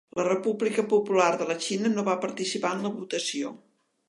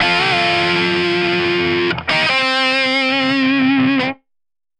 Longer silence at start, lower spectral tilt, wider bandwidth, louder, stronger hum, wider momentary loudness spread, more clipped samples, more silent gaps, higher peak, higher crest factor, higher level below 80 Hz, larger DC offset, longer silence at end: first, 0.15 s vs 0 s; about the same, -4 dB/octave vs -4.5 dB/octave; first, 11.5 kHz vs 10 kHz; second, -27 LUFS vs -15 LUFS; neither; first, 7 LU vs 3 LU; neither; neither; second, -8 dBFS vs -4 dBFS; first, 20 dB vs 12 dB; second, -80 dBFS vs -52 dBFS; neither; second, 0.5 s vs 0.65 s